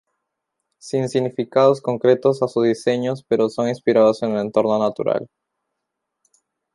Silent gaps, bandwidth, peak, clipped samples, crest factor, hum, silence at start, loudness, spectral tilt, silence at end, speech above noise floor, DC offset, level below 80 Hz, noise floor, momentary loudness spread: none; 11.5 kHz; -2 dBFS; under 0.1%; 18 dB; none; 0.85 s; -19 LUFS; -6.5 dB/octave; 1.5 s; 61 dB; under 0.1%; -66 dBFS; -79 dBFS; 7 LU